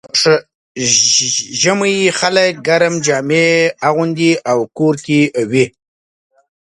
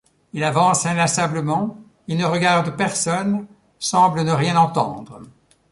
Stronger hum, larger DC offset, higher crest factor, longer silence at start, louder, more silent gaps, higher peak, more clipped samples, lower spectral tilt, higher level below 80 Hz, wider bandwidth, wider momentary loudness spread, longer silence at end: neither; neither; about the same, 14 dB vs 16 dB; second, 0.05 s vs 0.35 s; first, -13 LUFS vs -19 LUFS; first, 0.55-0.75 s vs none; first, 0 dBFS vs -4 dBFS; neither; second, -3 dB/octave vs -4.5 dB/octave; about the same, -58 dBFS vs -58 dBFS; about the same, 11.5 kHz vs 11.5 kHz; second, 6 LU vs 10 LU; first, 1.05 s vs 0.4 s